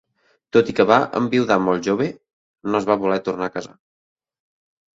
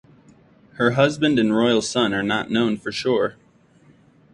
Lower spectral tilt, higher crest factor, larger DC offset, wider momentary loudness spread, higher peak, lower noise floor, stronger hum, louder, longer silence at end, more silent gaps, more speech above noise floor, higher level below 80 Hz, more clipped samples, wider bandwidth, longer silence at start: about the same, -6 dB/octave vs -5 dB/octave; about the same, 20 dB vs 18 dB; neither; first, 10 LU vs 5 LU; about the same, 0 dBFS vs -2 dBFS; about the same, -53 dBFS vs -54 dBFS; neither; about the same, -20 LUFS vs -20 LUFS; first, 1.3 s vs 1 s; first, 2.33-2.54 s vs none; about the same, 35 dB vs 35 dB; about the same, -58 dBFS vs -58 dBFS; neither; second, 7.8 kHz vs 11 kHz; second, 0.55 s vs 0.8 s